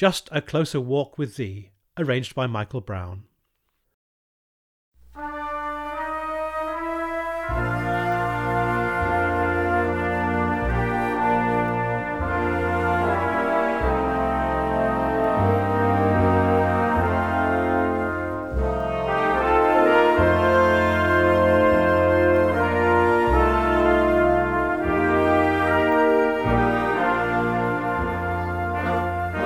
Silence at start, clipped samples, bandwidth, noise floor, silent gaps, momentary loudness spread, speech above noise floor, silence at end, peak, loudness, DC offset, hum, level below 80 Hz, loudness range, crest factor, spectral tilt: 0 s; under 0.1%; 15.5 kHz; -73 dBFS; 3.94-4.92 s; 10 LU; 47 dB; 0 s; -6 dBFS; -21 LUFS; 0.2%; none; -36 dBFS; 12 LU; 16 dB; -7 dB/octave